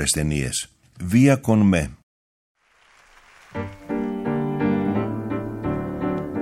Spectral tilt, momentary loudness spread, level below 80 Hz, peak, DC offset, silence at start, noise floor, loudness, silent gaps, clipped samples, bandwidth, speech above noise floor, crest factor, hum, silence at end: -5.5 dB/octave; 16 LU; -42 dBFS; -6 dBFS; under 0.1%; 0 s; -57 dBFS; -22 LUFS; 2.03-2.55 s; under 0.1%; 16 kHz; 38 dB; 18 dB; none; 0 s